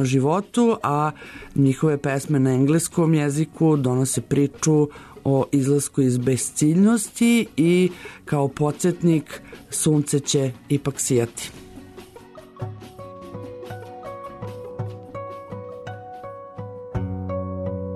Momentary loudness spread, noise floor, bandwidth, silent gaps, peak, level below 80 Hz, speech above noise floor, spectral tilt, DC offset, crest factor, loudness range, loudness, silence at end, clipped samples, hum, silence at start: 18 LU; -44 dBFS; 13.5 kHz; none; -8 dBFS; -52 dBFS; 24 dB; -6 dB/octave; under 0.1%; 14 dB; 15 LU; -21 LUFS; 0 s; under 0.1%; none; 0 s